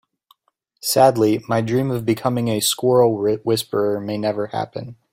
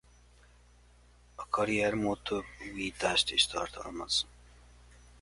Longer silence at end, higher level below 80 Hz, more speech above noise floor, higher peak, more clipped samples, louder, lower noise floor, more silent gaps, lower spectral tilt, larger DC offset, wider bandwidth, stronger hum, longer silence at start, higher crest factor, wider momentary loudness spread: second, 0.2 s vs 0.9 s; about the same, -58 dBFS vs -56 dBFS; first, 49 dB vs 28 dB; first, -2 dBFS vs -12 dBFS; neither; first, -19 LUFS vs -31 LUFS; first, -68 dBFS vs -60 dBFS; neither; first, -5 dB/octave vs -2.5 dB/octave; neither; first, 16.5 kHz vs 11.5 kHz; second, none vs 60 Hz at -55 dBFS; second, 0.85 s vs 1.4 s; about the same, 18 dB vs 22 dB; second, 10 LU vs 15 LU